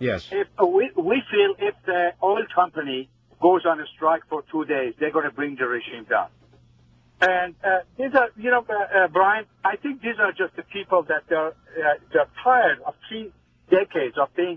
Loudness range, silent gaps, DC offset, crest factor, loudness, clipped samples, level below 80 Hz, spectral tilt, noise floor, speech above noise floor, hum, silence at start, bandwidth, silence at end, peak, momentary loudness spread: 3 LU; none; under 0.1%; 18 dB; -22 LUFS; under 0.1%; -60 dBFS; -6.5 dB/octave; -56 dBFS; 34 dB; none; 0 s; 7.4 kHz; 0 s; -4 dBFS; 9 LU